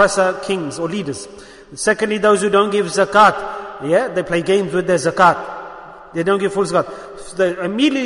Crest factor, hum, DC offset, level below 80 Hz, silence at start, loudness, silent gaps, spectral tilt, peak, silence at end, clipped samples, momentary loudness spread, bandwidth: 16 dB; none; under 0.1%; -52 dBFS; 0 s; -17 LUFS; none; -4.5 dB/octave; 0 dBFS; 0 s; under 0.1%; 17 LU; 11 kHz